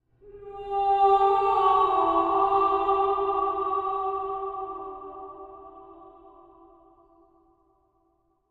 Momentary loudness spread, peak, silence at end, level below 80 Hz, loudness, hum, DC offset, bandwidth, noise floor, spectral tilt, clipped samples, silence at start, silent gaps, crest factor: 21 LU; -10 dBFS; 2.4 s; -56 dBFS; -24 LUFS; none; under 0.1%; 4.8 kHz; -70 dBFS; -6.5 dB/octave; under 0.1%; 0.25 s; none; 16 dB